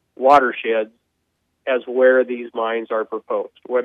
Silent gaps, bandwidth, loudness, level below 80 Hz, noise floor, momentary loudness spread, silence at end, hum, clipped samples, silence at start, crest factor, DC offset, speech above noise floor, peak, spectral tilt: none; 7.4 kHz; -19 LUFS; -66 dBFS; -71 dBFS; 12 LU; 0 s; none; under 0.1%; 0.2 s; 16 dB; under 0.1%; 53 dB; -2 dBFS; -5 dB/octave